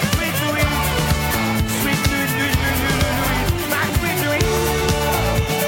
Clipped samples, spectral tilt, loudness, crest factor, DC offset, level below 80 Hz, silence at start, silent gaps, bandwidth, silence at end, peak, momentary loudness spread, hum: under 0.1%; -4 dB/octave; -19 LUFS; 16 dB; under 0.1%; -28 dBFS; 0 s; none; 17 kHz; 0 s; -2 dBFS; 1 LU; none